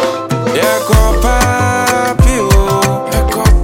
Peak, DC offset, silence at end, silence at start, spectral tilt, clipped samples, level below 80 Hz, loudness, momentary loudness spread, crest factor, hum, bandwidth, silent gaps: 0 dBFS; under 0.1%; 0 s; 0 s; -5 dB/octave; under 0.1%; -14 dBFS; -12 LUFS; 4 LU; 10 dB; none; 17 kHz; none